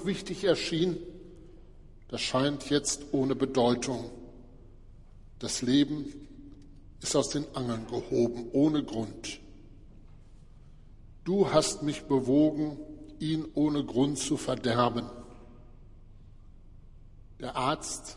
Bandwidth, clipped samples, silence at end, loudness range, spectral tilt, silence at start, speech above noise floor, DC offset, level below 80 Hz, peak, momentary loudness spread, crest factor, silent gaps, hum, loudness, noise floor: 11.5 kHz; under 0.1%; 0 s; 5 LU; -5 dB/octave; 0 s; 22 dB; under 0.1%; -52 dBFS; -10 dBFS; 17 LU; 20 dB; none; none; -29 LUFS; -51 dBFS